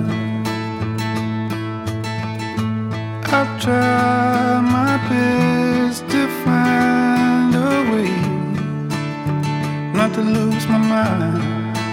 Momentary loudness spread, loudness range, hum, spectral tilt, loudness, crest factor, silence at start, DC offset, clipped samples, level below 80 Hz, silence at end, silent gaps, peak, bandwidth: 8 LU; 5 LU; none; -6.5 dB/octave; -18 LUFS; 16 dB; 0 s; under 0.1%; under 0.1%; -54 dBFS; 0 s; none; 0 dBFS; 16.5 kHz